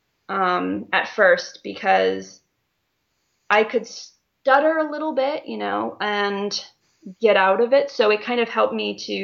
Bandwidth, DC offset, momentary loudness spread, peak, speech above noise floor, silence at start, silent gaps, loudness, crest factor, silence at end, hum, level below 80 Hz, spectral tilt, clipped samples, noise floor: 7.2 kHz; under 0.1%; 10 LU; -2 dBFS; 52 dB; 0.3 s; none; -20 LUFS; 20 dB; 0 s; none; -70 dBFS; -4 dB/octave; under 0.1%; -73 dBFS